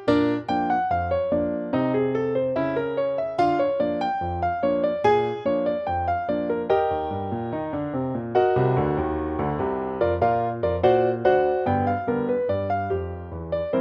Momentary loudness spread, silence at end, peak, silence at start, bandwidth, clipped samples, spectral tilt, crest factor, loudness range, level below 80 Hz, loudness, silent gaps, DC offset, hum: 7 LU; 0 s; -6 dBFS; 0 s; 7.6 kHz; under 0.1%; -8.5 dB/octave; 18 dB; 2 LU; -46 dBFS; -24 LUFS; none; under 0.1%; none